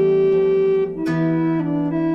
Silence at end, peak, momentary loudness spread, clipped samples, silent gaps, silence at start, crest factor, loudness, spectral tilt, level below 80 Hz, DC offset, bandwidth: 0 s; -10 dBFS; 5 LU; under 0.1%; none; 0 s; 8 dB; -19 LUFS; -9.5 dB/octave; -52 dBFS; under 0.1%; 5.8 kHz